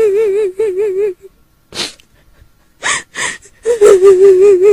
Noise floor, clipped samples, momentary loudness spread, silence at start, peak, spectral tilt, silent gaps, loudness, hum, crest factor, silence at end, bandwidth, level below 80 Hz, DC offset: -46 dBFS; 1%; 15 LU; 0 s; 0 dBFS; -3 dB/octave; none; -11 LUFS; none; 12 dB; 0 s; 12.5 kHz; -48 dBFS; under 0.1%